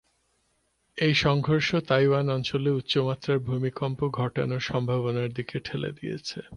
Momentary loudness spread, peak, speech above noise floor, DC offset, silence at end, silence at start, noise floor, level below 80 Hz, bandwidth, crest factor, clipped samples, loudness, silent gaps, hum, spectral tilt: 10 LU; -8 dBFS; 45 dB; under 0.1%; 0 s; 0.95 s; -71 dBFS; -56 dBFS; 10 kHz; 20 dB; under 0.1%; -26 LUFS; none; none; -6.5 dB/octave